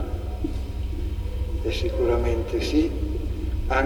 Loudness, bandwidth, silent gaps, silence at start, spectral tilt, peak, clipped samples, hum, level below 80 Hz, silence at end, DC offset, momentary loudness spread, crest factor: -27 LUFS; 19.5 kHz; none; 0 s; -7 dB/octave; -8 dBFS; under 0.1%; 50 Hz at -45 dBFS; -28 dBFS; 0 s; under 0.1%; 8 LU; 16 dB